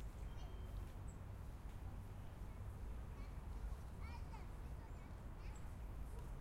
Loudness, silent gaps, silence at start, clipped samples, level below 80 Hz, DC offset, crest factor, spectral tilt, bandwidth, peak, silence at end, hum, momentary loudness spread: -54 LUFS; none; 0 s; under 0.1%; -52 dBFS; under 0.1%; 12 dB; -6.5 dB/octave; 16 kHz; -38 dBFS; 0 s; none; 2 LU